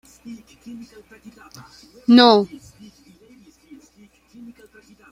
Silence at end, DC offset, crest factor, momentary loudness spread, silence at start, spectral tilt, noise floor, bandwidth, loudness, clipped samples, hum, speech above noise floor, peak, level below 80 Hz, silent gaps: 2.65 s; under 0.1%; 22 dB; 29 LU; 0.25 s; -5 dB/octave; -53 dBFS; 11 kHz; -15 LUFS; under 0.1%; none; 33 dB; -2 dBFS; -62 dBFS; none